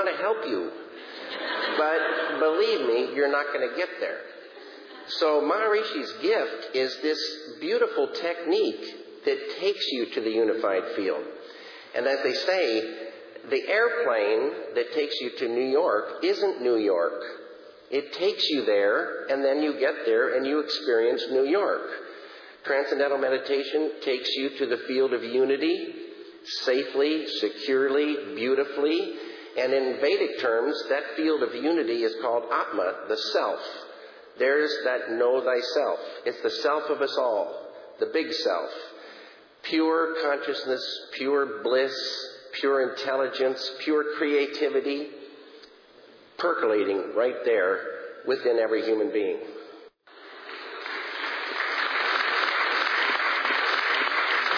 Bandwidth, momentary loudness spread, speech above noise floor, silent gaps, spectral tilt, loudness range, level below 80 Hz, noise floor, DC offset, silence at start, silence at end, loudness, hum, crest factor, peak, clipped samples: 5.4 kHz; 14 LU; 27 dB; none; -3.5 dB/octave; 3 LU; -86 dBFS; -52 dBFS; under 0.1%; 0 s; 0 s; -26 LUFS; none; 16 dB; -10 dBFS; under 0.1%